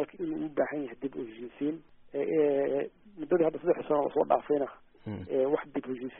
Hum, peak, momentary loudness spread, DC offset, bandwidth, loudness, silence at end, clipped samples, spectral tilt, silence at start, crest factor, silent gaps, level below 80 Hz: none; -10 dBFS; 14 LU; under 0.1%; 3.8 kHz; -31 LUFS; 0 s; under 0.1%; -3.5 dB/octave; 0 s; 20 dB; none; -66 dBFS